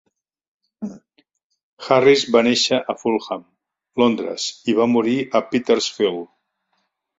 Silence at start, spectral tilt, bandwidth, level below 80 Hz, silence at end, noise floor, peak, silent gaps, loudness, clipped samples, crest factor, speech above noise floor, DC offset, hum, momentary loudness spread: 0.8 s; -4 dB/octave; 7.8 kHz; -64 dBFS; 0.95 s; -71 dBFS; -2 dBFS; 1.44-1.50 s, 1.63-1.77 s; -18 LUFS; under 0.1%; 18 dB; 53 dB; under 0.1%; none; 18 LU